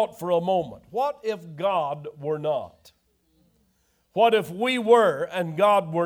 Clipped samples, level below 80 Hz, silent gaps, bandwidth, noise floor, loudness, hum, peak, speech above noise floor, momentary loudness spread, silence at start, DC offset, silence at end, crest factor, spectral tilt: under 0.1%; -68 dBFS; none; 20 kHz; -68 dBFS; -24 LUFS; none; -6 dBFS; 44 dB; 13 LU; 0 s; under 0.1%; 0 s; 18 dB; -5.5 dB/octave